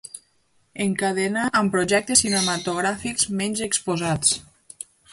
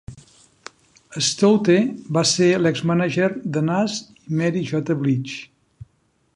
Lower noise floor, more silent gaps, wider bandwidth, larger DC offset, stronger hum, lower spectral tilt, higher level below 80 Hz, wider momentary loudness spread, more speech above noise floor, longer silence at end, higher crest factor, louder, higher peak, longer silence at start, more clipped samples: about the same, -64 dBFS vs -64 dBFS; neither; about the same, 11.5 kHz vs 11.5 kHz; neither; neither; second, -3 dB/octave vs -5 dB/octave; about the same, -54 dBFS vs -58 dBFS; first, 21 LU vs 10 LU; second, 41 dB vs 45 dB; second, 0.7 s vs 0.9 s; about the same, 22 dB vs 18 dB; about the same, -21 LUFS vs -20 LUFS; about the same, -2 dBFS vs -4 dBFS; about the same, 0.15 s vs 0.1 s; neither